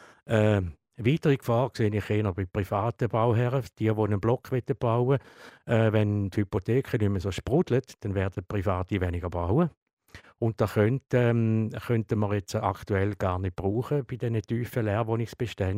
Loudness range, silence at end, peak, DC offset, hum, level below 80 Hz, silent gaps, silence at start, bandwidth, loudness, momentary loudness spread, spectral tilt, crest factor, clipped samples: 2 LU; 0 s; -8 dBFS; under 0.1%; none; -50 dBFS; 9.77-9.86 s, 9.93-9.97 s; 0 s; 15.5 kHz; -27 LUFS; 6 LU; -8 dB/octave; 18 dB; under 0.1%